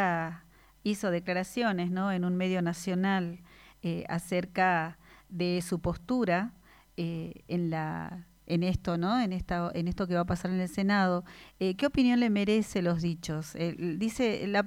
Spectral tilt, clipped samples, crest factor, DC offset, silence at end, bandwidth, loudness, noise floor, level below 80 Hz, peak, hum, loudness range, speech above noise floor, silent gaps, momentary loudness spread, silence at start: -6.5 dB/octave; under 0.1%; 18 dB; under 0.1%; 0 s; 16 kHz; -31 LUFS; -56 dBFS; -52 dBFS; -12 dBFS; none; 4 LU; 26 dB; none; 11 LU; 0 s